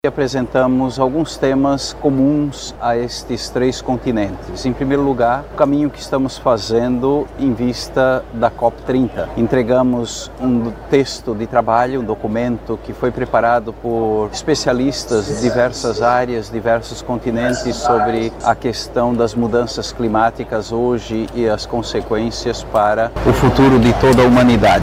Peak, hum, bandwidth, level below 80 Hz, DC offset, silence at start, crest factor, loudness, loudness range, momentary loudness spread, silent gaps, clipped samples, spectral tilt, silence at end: 0 dBFS; none; 15.5 kHz; -34 dBFS; under 0.1%; 0.05 s; 16 dB; -16 LUFS; 2 LU; 7 LU; none; under 0.1%; -6 dB/octave; 0 s